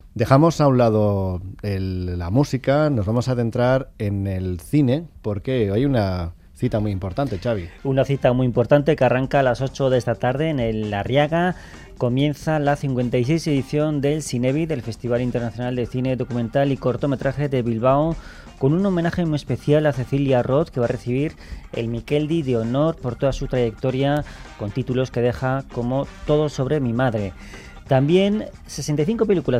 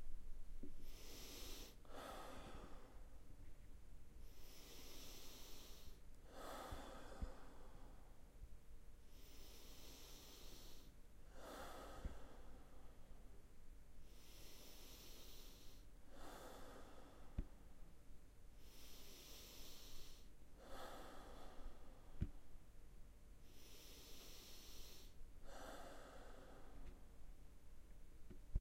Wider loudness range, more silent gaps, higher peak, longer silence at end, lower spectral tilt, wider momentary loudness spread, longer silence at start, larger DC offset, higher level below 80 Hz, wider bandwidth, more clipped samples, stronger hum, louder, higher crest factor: about the same, 3 LU vs 4 LU; neither; first, -2 dBFS vs -30 dBFS; about the same, 0 s vs 0 s; first, -7.5 dB/octave vs -4 dB/octave; second, 9 LU vs 12 LU; about the same, 0.05 s vs 0 s; neither; first, -42 dBFS vs -58 dBFS; second, 14 kHz vs 16 kHz; neither; neither; first, -21 LUFS vs -60 LUFS; about the same, 18 dB vs 22 dB